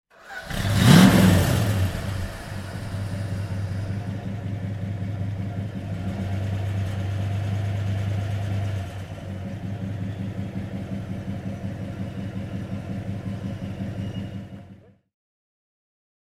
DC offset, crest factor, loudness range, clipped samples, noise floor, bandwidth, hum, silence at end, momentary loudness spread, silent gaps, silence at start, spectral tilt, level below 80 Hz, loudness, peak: under 0.1%; 24 dB; 13 LU; under 0.1%; -49 dBFS; 16.5 kHz; none; 1.65 s; 13 LU; none; 0.2 s; -6 dB/octave; -42 dBFS; -26 LUFS; -2 dBFS